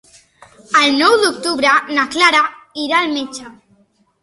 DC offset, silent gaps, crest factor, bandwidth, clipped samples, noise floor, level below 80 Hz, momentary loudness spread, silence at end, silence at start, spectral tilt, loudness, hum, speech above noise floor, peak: under 0.1%; none; 16 dB; 12 kHz; under 0.1%; -56 dBFS; -58 dBFS; 12 LU; 0.7 s; 0.7 s; -1.5 dB/octave; -14 LUFS; none; 41 dB; 0 dBFS